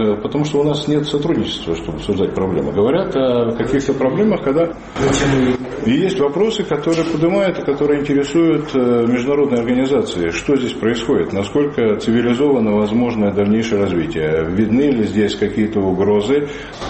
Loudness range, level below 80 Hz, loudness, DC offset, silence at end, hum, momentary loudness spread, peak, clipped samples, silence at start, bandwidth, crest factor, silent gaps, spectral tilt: 1 LU; -40 dBFS; -17 LUFS; under 0.1%; 0 s; none; 4 LU; -4 dBFS; under 0.1%; 0 s; 8.6 kHz; 12 dB; none; -6.5 dB/octave